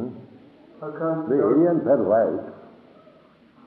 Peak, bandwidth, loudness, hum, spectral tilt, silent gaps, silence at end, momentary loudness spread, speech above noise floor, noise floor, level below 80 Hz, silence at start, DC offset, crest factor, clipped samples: -8 dBFS; 4.2 kHz; -21 LUFS; none; -12 dB/octave; none; 1 s; 19 LU; 33 dB; -53 dBFS; -72 dBFS; 0 s; under 0.1%; 16 dB; under 0.1%